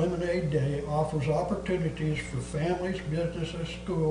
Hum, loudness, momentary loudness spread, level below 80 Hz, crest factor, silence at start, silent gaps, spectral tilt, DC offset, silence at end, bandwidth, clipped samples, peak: none; -30 LUFS; 5 LU; -46 dBFS; 14 dB; 0 s; none; -7 dB/octave; under 0.1%; 0 s; 10 kHz; under 0.1%; -16 dBFS